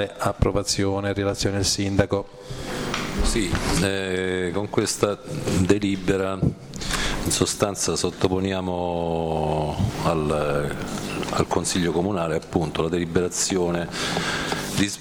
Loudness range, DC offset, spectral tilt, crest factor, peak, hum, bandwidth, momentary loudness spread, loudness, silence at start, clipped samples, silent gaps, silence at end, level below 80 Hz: 1 LU; under 0.1%; -4.5 dB/octave; 18 dB; -6 dBFS; none; over 20 kHz; 5 LU; -24 LUFS; 0 s; under 0.1%; none; 0 s; -36 dBFS